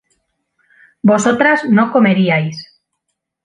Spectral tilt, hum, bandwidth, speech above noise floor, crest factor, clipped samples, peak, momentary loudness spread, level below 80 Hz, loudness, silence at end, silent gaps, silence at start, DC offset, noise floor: -6 dB/octave; none; 10.5 kHz; 62 dB; 14 dB; under 0.1%; 0 dBFS; 7 LU; -62 dBFS; -13 LUFS; 0.8 s; none; 1.05 s; under 0.1%; -74 dBFS